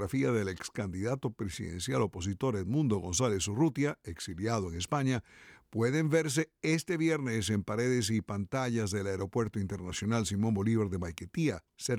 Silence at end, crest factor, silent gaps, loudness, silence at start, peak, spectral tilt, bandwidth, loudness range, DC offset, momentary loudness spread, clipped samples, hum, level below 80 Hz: 0 s; 16 dB; none; -32 LUFS; 0 s; -16 dBFS; -5.5 dB/octave; 16 kHz; 2 LU; under 0.1%; 8 LU; under 0.1%; none; -56 dBFS